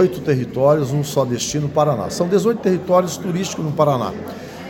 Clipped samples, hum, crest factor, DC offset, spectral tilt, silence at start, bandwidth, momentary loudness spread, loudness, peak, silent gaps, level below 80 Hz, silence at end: under 0.1%; none; 16 dB; under 0.1%; -6 dB/octave; 0 s; 17 kHz; 6 LU; -19 LUFS; -2 dBFS; none; -50 dBFS; 0 s